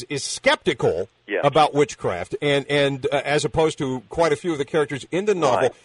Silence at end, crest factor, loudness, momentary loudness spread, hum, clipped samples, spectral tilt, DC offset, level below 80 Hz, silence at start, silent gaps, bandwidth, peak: 0.1 s; 16 dB; -21 LUFS; 8 LU; none; under 0.1%; -4.5 dB/octave; under 0.1%; -52 dBFS; 0 s; none; 11 kHz; -6 dBFS